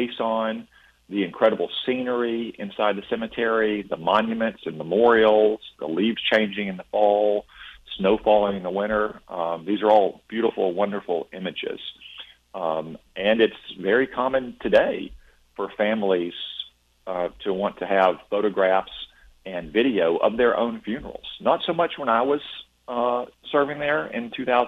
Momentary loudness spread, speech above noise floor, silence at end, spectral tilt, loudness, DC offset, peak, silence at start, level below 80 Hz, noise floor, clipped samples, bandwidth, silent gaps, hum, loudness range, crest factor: 14 LU; 21 dB; 0 s; -7 dB/octave; -23 LUFS; under 0.1%; -6 dBFS; 0 s; -56 dBFS; -44 dBFS; under 0.1%; 6.6 kHz; none; none; 4 LU; 18 dB